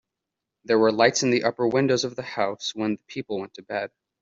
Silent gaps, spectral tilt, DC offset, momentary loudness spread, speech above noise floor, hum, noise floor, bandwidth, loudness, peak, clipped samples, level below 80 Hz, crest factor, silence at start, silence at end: none; -4 dB/octave; under 0.1%; 13 LU; 61 dB; none; -85 dBFS; 7.8 kHz; -24 LUFS; -4 dBFS; under 0.1%; -68 dBFS; 20 dB; 0.7 s; 0.35 s